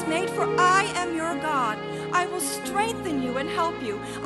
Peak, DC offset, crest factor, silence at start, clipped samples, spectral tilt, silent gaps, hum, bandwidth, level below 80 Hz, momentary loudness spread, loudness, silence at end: -8 dBFS; under 0.1%; 18 dB; 0 s; under 0.1%; -3.5 dB/octave; none; none; 12 kHz; -56 dBFS; 8 LU; -25 LUFS; 0 s